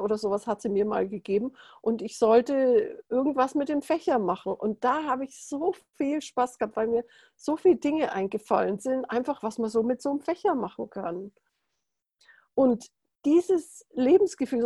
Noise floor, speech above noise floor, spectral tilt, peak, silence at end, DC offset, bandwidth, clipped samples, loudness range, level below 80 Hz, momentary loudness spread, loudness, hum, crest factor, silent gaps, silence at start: -82 dBFS; 56 dB; -6 dB/octave; -10 dBFS; 0 s; under 0.1%; 12 kHz; under 0.1%; 5 LU; -68 dBFS; 10 LU; -27 LUFS; none; 18 dB; none; 0 s